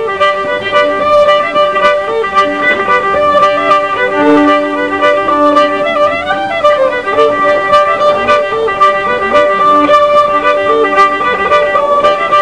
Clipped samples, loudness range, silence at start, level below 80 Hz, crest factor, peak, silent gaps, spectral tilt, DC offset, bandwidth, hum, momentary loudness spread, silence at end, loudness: 0.4%; 1 LU; 0 s; -44 dBFS; 10 dB; 0 dBFS; none; -4.5 dB/octave; 0.6%; 10.5 kHz; none; 4 LU; 0 s; -9 LUFS